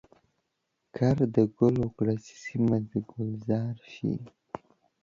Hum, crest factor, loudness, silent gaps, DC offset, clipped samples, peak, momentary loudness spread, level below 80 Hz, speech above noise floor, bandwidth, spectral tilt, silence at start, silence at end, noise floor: none; 20 dB; -29 LUFS; none; under 0.1%; under 0.1%; -10 dBFS; 19 LU; -58 dBFS; 52 dB; 7.6 kHz; -9 dB/octave; 0.95 s; 0.45 s; -80 dBFS